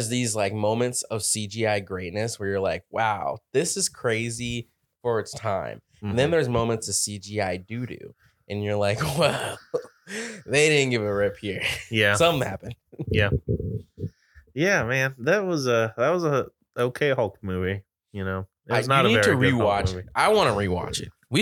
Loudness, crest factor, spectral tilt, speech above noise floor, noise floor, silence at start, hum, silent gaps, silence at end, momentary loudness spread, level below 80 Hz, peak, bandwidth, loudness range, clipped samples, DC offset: -24 LUFS; 22 dB; -4 dB/octave; 21 dB; -46 dBFS; 0 s; none; none; 0 s; 14 LU; -48 dBFS; -4 dBFS; 19 kHz; 5 LU; under 0.1%; under 0.1%